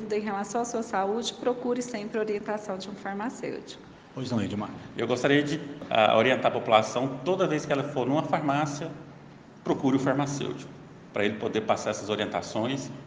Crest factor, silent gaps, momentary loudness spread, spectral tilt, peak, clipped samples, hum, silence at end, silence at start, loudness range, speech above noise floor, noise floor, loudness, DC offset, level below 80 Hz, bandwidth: 24 dB; none; 13 LU; -5 dB/octave; -6 dBFS; under 0.1%; none; 0 s; 0 s; 7 LU; 21 dB; -49 dBFS; -28 LUFS; under 0.1%; -66 dBFS; 9.8 kHz